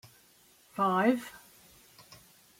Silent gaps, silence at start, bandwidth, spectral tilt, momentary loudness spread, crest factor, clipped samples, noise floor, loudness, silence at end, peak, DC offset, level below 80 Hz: none; 0.75 s; 16.5 kHz; -6 dB/octave; 27 LU; 20 dB; under 0.1%; -62 dBFS; -29 LUFS; 0.45 s; -14 dBFS; under 0.1%; -74 dBFS